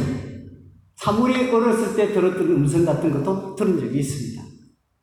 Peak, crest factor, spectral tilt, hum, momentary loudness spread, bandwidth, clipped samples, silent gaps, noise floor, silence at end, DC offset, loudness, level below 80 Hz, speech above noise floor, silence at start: -8 dBFS; 14 dB; -7 dB/octave; none; 13 LU; 14 kHz; under 0.1%; none; -52 dBFS; 0.5 s; under 0.1%; -21 LUFS; -52 dBFS; 32 dB; 0 s